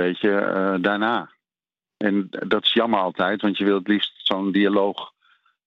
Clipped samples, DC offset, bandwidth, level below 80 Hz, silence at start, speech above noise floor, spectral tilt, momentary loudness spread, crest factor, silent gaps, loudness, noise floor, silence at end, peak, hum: under 0.1%; under 0.1%; 6 kHz; -70 dBFS; 0 s; over 69 dB; -7.5 dB/octave; 7 LU; 20 dB; none; -21 LUFS; under -90 dBFS; 0.6 s; -2 dBFS; none